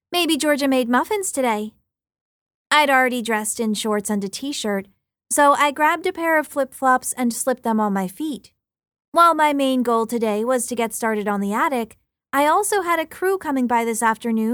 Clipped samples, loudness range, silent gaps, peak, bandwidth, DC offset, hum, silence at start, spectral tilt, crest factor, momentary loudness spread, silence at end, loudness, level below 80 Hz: under 0.1%; 2 LU; 2.21-2.46 s, 2.54-2.65 s, 9.08-9.12 s; -4 dBFS; 20 kHz; under 0.1%; none; 0.1 s; -3 dB/octave; 18 dB; 9 LU; 0 s; -20 LUFS; -64 dBFS